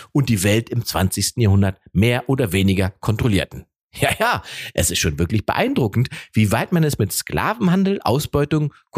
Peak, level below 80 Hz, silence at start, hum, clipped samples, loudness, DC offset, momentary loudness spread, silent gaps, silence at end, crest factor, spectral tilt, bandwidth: -2 dBFS; -40 dBFS; 0 s; none; under 0.1%; -19 LUFS; under 0.1%; 5 LU; 3.83-3.90 s; 0 s; 18 dB; -5 dB/octave; 15.5 kHz